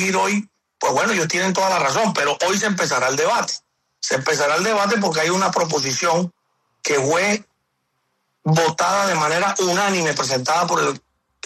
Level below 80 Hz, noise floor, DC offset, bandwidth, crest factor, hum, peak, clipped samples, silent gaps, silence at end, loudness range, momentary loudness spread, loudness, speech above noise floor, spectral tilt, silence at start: -64 dBFS; -71 dBFS; under 0.1%; 14 kHz; 12 dB; none; -8 dBFS; under 0.1%; none; 0.5 s; 2 LU; 6 LU; -19 LUFS; 52 dB; -3.5 dB/octave; 0 s